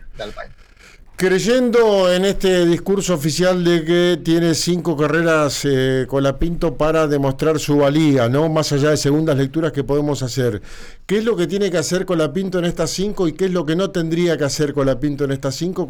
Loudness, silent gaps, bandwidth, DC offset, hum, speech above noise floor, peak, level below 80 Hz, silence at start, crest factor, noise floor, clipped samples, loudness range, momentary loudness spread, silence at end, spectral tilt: -17 LUFS; none; over 20 kHz; 0.1%; none; 27 dB; -8 dBFS; -36 dBFS; 0 s; 10 dB; -44 dBFS; under 0.1%; 4 LU; 6 LU; 0 s; -5.5 dB/octave